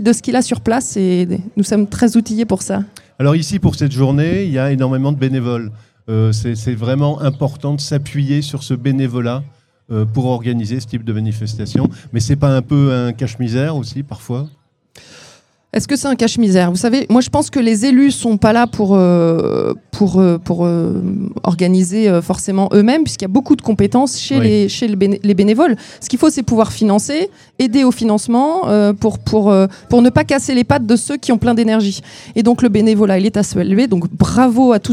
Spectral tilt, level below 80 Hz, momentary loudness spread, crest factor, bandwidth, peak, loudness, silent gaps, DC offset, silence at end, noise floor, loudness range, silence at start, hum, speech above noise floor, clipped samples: -6.5 dB/octave; -42 dBFS; 9 LU; 14 dB; 14 kHz; 0 dBFS; -14 LUFS; none; under 0.1%; 0 s; -38 dBFS; 6 LU; 0 s; none; 24 dB; under 0.1%